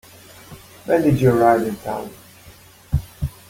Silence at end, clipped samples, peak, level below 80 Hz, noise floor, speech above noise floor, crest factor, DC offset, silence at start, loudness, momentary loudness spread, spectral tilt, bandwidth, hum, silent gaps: 0.2 s; under 0.1%; -2 dBFS; -38 dBFS; -46 dBFS; 29 dB; 18 dB; under 0.1%; 0.5 s; -19 LUFS; 25 LU; -7.5 dB/octave; 17 kHz; none; none